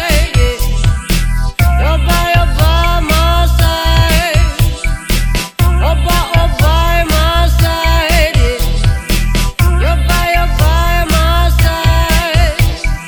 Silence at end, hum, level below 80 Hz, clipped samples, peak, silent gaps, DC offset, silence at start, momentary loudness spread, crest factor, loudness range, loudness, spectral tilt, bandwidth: 0 s; none; -12 dBFS; under 0.1%; 0 dBFS; none; under 0.1%; 0 s; 4 LU; 10 dB; 1 LU; -12 LUFS; -4.5 dB/octave; 19.5 kHz